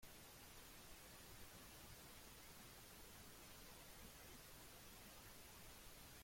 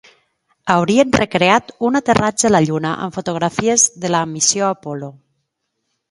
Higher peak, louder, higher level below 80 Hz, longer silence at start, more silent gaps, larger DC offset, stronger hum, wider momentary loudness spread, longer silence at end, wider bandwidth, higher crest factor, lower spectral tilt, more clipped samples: second, -46 dBFS vs 0 dBFS; second, -60 LUFS vs -16 LUFS; second, -70 dBFS vs -48 dBFS; second, 0 s vs 0.65 s; neither; neither; neither; second, 1 LU vs 10 LU; second, 0 s vs 1 s; first, 16.5 kHz vs 11.5 kHz; about the same, 14 dB vs 18 dB; about the same, -2.5 dB/octave vs -3.5 dB/octave; neither